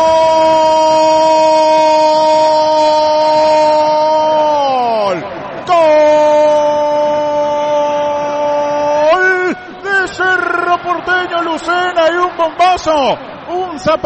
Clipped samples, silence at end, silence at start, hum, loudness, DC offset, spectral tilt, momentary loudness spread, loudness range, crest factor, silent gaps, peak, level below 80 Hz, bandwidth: under 0.1%; 0 s; 0 s; none; -11 LUFS; under 0.1%; -3.5 dB/octave; 7 LU; 4 LU; 10 dB; none; -2 dBFS; -48 dBFS; 8.6 kHz